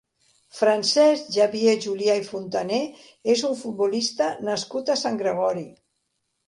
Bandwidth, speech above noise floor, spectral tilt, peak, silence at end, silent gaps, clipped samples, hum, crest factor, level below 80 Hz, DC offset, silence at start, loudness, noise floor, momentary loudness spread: 11.5 kHz; 53 dB; -3.5 dB/octave; -6 dBFS; 0.75 s; none; under 0.1%; none; 16 dB; -72 dBFS; under 0.1%; 0.55 s; -23 LUFS; -75 dBFS; 9 LU